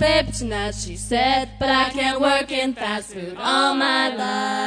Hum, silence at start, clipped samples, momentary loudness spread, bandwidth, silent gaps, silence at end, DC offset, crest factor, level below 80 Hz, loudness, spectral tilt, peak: none; 0 s; under 0.1%; 8 LU; 10 kHz; none; 0 s; under 0.1%; 16 dB; -40 dBFS; -21 LUFS; -3.5 dB/octave; -6 dBFS